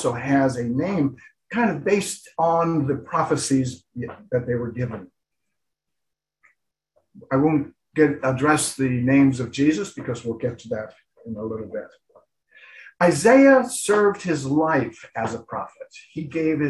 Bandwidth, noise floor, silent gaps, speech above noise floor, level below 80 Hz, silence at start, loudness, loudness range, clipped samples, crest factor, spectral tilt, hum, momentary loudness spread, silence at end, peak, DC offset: 12.5 kHz; -82 dBFS; none; 61 dB; -56 dBFS; 0 s; -22 LUFS; 10 LU; under 0.1%; 20 dB; -5.5 dB/octave; none; 15 LU; 0 s; -4 dBFS; under 0.1%